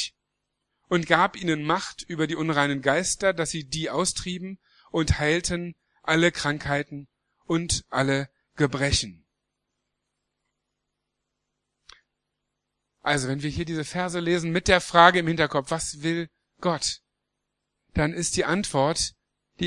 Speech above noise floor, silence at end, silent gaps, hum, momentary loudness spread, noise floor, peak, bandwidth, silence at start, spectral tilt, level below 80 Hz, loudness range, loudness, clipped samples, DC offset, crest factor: 57 dB; 0 s; none; 50 Hz at -60 dBFS; 11 LU; -81 dBFS; 0 dBFS; 12 kHz; 0 s; -4 dB/octave; -46 dBFS; 8 LU; -24 LUFS; under 0.1%; under 0.1%; 26 dB